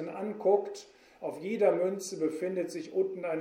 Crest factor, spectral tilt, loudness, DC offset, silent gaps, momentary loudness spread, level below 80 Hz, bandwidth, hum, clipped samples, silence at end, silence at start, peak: 20 dB; -5.5 dB/octave; -31 LUFS; under 0.1%; none; 13 LU; -80 dBFS; 15 kHz; none; under 0.1%; 0 s; 0 s; -12 dBFS